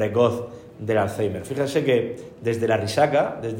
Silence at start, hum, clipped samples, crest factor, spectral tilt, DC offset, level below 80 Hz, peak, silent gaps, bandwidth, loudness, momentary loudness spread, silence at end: 0 s; none; under 0.1%; 18 dB; -6 dB/octave; under 0.1%; -60 dBFS; -6 dBFS; none; 16 kHz; -23 LUFS; 11 LU; 0 s